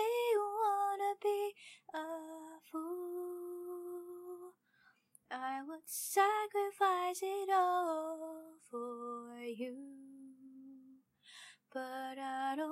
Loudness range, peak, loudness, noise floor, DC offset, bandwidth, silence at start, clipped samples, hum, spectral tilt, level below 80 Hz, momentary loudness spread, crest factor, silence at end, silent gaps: 13 LU; -18 dBFS; -38 LUFS; -72 dBFS; under 0.1%; 16 kHz; 0 s; under 0.1%; none; -1.5 dB/octave; under -90 dBFS; 22 LU; 22 dB; 0 s; none